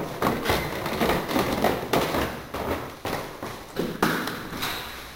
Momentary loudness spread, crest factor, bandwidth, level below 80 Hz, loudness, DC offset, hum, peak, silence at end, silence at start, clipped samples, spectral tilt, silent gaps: 8 LU; 22 dB; 17 kHz; -44 dBFS; -27 LUFS; under 0.1%; none; -6 dBFS; 0 s; 0 s; under 0.1%; -4.5 dB/octave; none